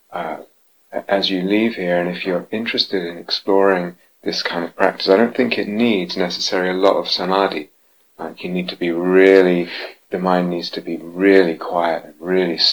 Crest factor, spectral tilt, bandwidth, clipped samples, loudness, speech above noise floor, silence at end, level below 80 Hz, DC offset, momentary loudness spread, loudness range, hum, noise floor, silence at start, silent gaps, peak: 18 dB; -5.5 dB/octave; over 20 kHz; under 0.1%; -18 LUFS; 25 dB; 0 s; -66 dBFS; 0.1%; 14 LU; 4 LU; none; -42 dBFS; 0.1 s; none; 0 dBFS